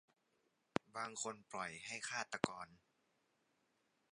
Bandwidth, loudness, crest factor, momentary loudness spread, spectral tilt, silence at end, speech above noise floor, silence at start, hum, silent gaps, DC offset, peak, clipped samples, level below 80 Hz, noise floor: 11 kHz; -45 LUFS; 34 dB; 5 LU; -3 dB/octave; 1.35 s; 36 dB; 0.95 s; none; none; under 0.1%; -14 dBFS; under 0.1%; -80 dBFS; -82 dBFS